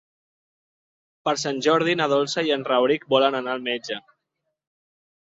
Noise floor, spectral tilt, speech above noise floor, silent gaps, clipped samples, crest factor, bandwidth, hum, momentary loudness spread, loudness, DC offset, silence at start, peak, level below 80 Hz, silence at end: -79 dBFS; -4 dB/octave; 57 dB; none; under 0.1%; 20 dB; 8 kHz; none; 9 LU; -22 LUFS; under 0.1%; 1.25 s; -6 dBFS; -70 dBFS; 1.2 s